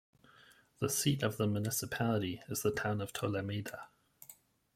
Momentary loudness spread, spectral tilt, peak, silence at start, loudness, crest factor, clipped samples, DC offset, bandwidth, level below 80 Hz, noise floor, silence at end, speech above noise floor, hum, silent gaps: 22 LU; -4.5 dB/octave; -16 dBFS; 0.8 s; -35 LUFS; 20 dB; under 0.1%; under 0.1%; 16.5 kHz; -68 dBFS; -63 dBFS; 0.4 s; 28 dB; none; none